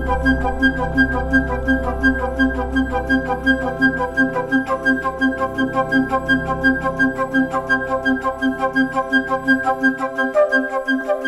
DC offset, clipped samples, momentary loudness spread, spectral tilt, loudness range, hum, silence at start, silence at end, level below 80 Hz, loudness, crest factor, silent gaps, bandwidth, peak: under 0.1%; under 0.1%; 3 LU; -6.5 dB/octave; 0 LU; none; 0 s; 0 s; -32 dBFS; -18 LUFS; 16 dB; none; 12 kHz; -2 dBFS